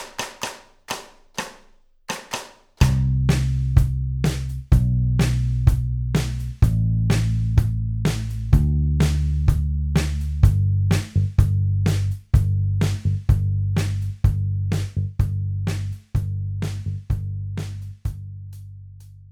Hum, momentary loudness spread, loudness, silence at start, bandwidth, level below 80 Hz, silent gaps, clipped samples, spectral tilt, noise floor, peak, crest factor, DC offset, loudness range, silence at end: none; 13 LU; -22 LUFS; 0 s; 15.5 kHz; -26 dBFS; none; under 0.1%; -6.5 dB/octave; -53 dBFS; -2 dBFS; 20 dB; under 0.1%; 6 LU; 0.1 s